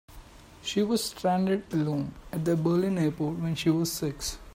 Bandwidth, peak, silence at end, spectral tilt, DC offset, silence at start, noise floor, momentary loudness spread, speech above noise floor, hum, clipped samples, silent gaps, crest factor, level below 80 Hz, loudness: 16 kHz; -12 dBFS; 0.05 s; -5.5 dB/octave; under 0.1%; 0.1 s; -49 dBFS; 7 LU; 21 dB; none; under 0.1%; none; 16 dB; -52 dBFS; -28 LUFS